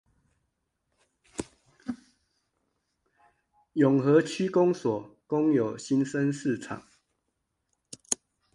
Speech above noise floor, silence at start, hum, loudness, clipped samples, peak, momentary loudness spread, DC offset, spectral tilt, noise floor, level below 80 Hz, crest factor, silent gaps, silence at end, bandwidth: 55 dB; 1.4 s; none; -27 LUFS; under 0.1%; -8 dBFS; 18 LU; under 0.1%; -6 dB/octave; -80 dBFS; -68 dBFS; 22 dB; none; 0.4 s; 11.5 kHz